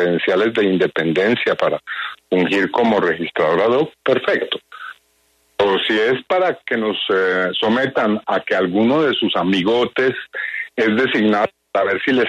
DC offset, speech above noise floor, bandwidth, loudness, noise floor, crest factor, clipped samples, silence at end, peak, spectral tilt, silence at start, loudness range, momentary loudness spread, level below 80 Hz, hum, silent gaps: under 0.1%; 44 dB; 10 kHz; -18 LUFS; -61 dBFS; 14 dB; under 0.1%; 0 s; -4 dBFS; -6 dB/octave; 0 s; 2 LU; 8 LU; -62 dBFS; none; none